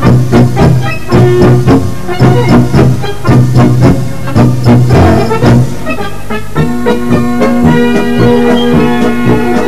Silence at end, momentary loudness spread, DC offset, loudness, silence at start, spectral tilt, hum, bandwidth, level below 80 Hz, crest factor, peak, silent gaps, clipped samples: 0 s; 7 LU; 20%; -8 LUFS; 0 s; -7.5 dB/octave; none; 14 kHz; -24 dBFS; 8 dB; 0 dBFS; none; 4%